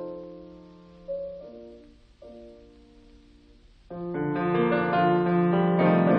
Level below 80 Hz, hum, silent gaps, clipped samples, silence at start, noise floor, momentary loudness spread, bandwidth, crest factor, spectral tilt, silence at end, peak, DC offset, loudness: -58 dBFS; none; none; under 0.1%; 0 s; -55 dBFS; 25 LU; 4.9 kHz; 18 dB; -10.5 dB/octave; 0 s; -10 dBFS; under 0.1%; -25 LUFS